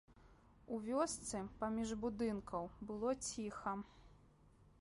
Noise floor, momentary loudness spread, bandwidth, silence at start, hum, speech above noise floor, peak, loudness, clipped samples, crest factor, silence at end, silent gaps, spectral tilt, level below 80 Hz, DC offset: -68 dBFS; 8 LU; 11.5 kHz; 0.1 s; none; 25 dB; -26 dBFS; -43 LUFS; under 0.1%; 18 dB; 0.15 s; none; -4.5 dB/octave; -64 dBFS; under 0.1%